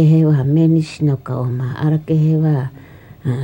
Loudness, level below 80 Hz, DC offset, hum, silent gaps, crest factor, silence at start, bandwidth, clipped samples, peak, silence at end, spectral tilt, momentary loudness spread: -16 LUFS; -50 dBFS; under 0.1%; none; none; 12 dB; 0 s; 8.6 kHz; under 0.1%; -4 dBFS; 0 s; -9.5 dB/octave; 9 LU